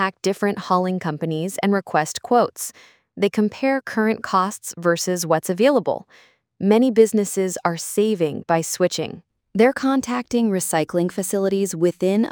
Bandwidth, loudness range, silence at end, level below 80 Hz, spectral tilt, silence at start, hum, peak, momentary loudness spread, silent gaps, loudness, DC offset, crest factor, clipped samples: 20 kHz; 2 LU; 0 s; -64 dBFS; -5 dB/octave; 0 s; none; -2 dBFS; 7 LU; none; -21 LUFS; under 0.1%; 18 dB; under 0.1%